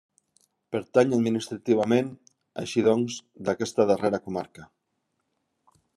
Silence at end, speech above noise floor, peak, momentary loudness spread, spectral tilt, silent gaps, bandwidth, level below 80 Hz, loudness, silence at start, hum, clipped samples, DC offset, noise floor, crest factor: 1.3 s; 53 dB; -6 dBFS; 12 LU; -6 dB/octave; none; 12.5 kHz; -72 dBFS; -26 LUFS; 0.7 s; none; under 0.1%; under 0.1%; -78 dBFS; 20 dB